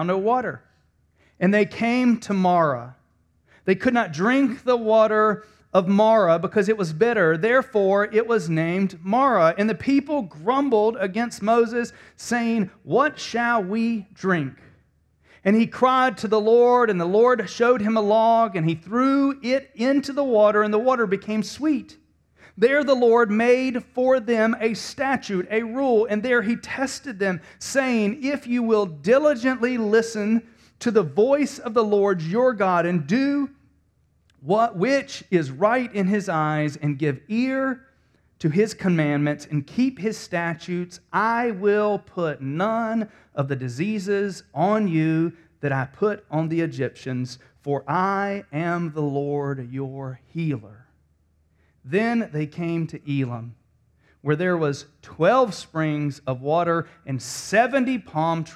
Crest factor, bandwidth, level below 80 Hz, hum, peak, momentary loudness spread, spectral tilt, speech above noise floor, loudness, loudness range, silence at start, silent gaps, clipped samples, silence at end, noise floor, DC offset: 18 dB; 13 kHz; -62 dBFS; none; -4 dBFS; 10 LU; -6.5 dB/octave; 42 dB; -22 LUFS; 6 LU; 0 s; none; under 0.1%; 0 s; -64 dBFS; under 0.1%